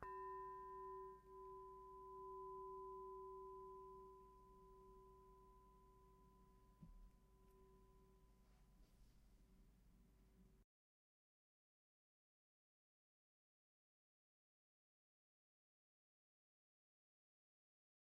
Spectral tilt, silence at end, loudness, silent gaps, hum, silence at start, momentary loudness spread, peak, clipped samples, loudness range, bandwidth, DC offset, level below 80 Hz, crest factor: -6.5 dB/octave; 7.5 s; -58 LUFS; none; none; 0 s; 14 LU; -36 dBFS; under 0.1%; 12 LU; 6.8 kHz; under 0.1%; -74 dBFS; 26 dB